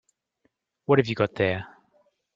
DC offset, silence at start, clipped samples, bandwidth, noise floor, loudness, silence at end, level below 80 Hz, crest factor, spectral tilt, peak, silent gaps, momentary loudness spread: under 0.1%; 0.9 s; under 0.1%; 7.6 kHz; -73 dBFS; -24 LUFS; 0.7 s; -64 dBFS; 22 dB; -7.5 dB/octave; -4 dBFS; none; 17 LU